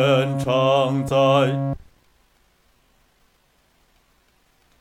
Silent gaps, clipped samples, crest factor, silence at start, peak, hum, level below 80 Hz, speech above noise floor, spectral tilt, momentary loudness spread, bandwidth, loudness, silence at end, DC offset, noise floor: none; under 0.1%; 18 dB; 0 s; -6 dBFS; none; -52 dBFS; 43 dB; -6.5 dB/octave; 10 LU; 13.5 kHz; -19 LUFS; 3.05 s; under 0.1%; -62 dBFS